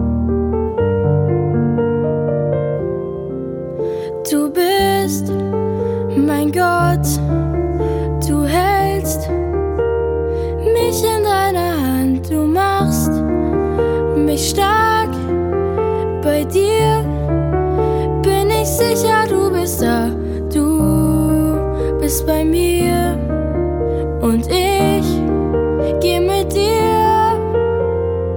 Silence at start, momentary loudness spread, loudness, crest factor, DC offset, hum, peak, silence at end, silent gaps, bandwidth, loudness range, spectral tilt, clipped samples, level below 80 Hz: 0 s; 5 LU; -16 LUFS; 14 dB; under 0.1%; none; -2 dBFS; 0 s; none; 19 kHz; 2 LU; -6 dB/octave; under 0.1%; -28 dBFS